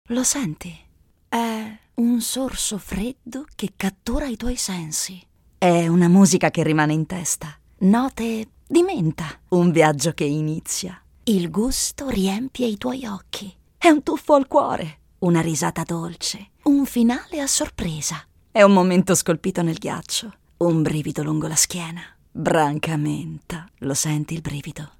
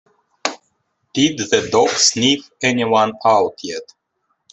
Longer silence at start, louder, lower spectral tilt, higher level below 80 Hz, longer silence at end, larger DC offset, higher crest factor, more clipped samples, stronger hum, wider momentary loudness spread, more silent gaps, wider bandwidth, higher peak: second, 0.1 s vs 0.45 s; second, -21 LUFS vs -16 LUFS; first, -4.5 dB/octave vs -2.5 dB/octave; first, -44 dBFS vs -60 dBFS; second, 0.1 s vs 0.7 s; neither; about the same, 22 dB vs 18 dB; neither; neither; about the same, 14 LU vs 13 LU; neither; first, 17.5 kHz vs 8.4 kHz; about the same, 0 dBFS vs 0 dBFS